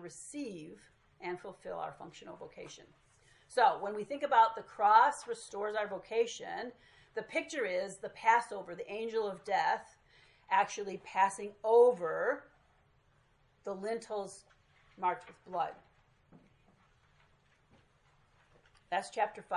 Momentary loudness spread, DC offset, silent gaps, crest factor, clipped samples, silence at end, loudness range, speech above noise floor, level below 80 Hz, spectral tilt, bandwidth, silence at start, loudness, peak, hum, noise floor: 20 LU; under 0.1%; none; 22 dB; under 0.1%; 0 s; 12 LU; 36 dB; -76 dBFS; -3.5 dB/octave; 11.5 kHz; 0 s; -33 LUFS; -12 dBFS; none; -70 dBFS